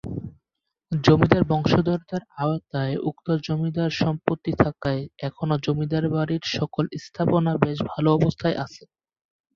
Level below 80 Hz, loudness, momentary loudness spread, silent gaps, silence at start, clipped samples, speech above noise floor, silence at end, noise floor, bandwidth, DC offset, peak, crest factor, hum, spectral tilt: -48 dBFS; -24 LUFS; 10 LU; none; 0.05 s; under 0.1%; 60 dB; 0.8 s; -83 dBFS; 7.2 kHz; under 0.1%; -2 dBFS; 22 dB; none; -7.5 dB/octave